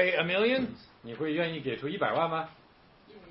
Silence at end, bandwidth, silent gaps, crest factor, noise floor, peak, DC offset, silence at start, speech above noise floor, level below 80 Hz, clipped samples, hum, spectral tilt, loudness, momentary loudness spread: 0 s; 5.8 kHz; none; 20 dB; -59 dBFS; -12 dBFS; under 0.1%; 0 s; 29 dB; -66 dBFS; under 0.1%; none; -9 dB/octave; -30 LUFS; 15 LU